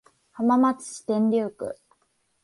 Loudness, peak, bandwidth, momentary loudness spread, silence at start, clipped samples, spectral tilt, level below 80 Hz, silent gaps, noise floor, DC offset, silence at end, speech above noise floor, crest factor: -24 LUFS; -10 dBFS; 11.5 kHz; 15 LU; 0.35 s; under 0.1%; -6 dB/octave; -70 dBFS; none; -70 dBFS; under 0.1%; 0.7 s; 47 dB; 14 dB